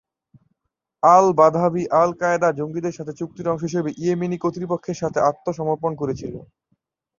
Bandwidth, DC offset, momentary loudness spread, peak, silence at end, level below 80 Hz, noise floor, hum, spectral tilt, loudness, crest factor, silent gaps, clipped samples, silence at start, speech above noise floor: 7.4 kHz; under 0.1%; 13 LU; -2 dBFS; 0.8 s; -58 dBFS; -79 dBFS; none; -7 dB/octave; -20 LUFS; 20 dB; none; under 0.1%; 1.05 s; 59 dB